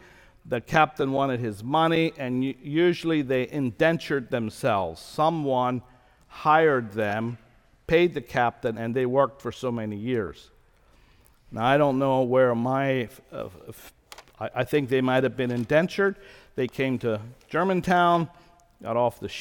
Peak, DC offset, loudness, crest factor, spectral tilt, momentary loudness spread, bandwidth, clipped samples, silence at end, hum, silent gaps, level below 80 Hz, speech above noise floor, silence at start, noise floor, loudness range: -6 dBFS; under 0.1%; -25 LUFS; 20 dB; -6.5 dB/octave; 12 LU; 18 kHz; under 0.1%; 0 s; none; none; -56 dBFS; 33 dB; 0.45 s; -58 dBFS; 2 LU